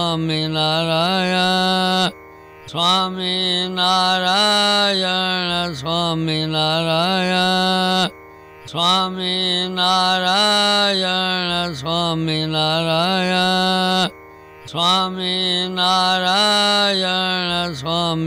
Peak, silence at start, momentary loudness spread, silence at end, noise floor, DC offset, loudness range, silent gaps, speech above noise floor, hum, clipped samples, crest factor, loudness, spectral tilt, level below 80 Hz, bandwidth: -4 dBFS; 0 s; 6 LU; 0 s; -41 dBFS; under 0.1%; 2 LU; none; 23 dB; none; under 0.1%; 14 dB; -17 LUFS; -4 dB/octave; -52 dBFS; 16 kHz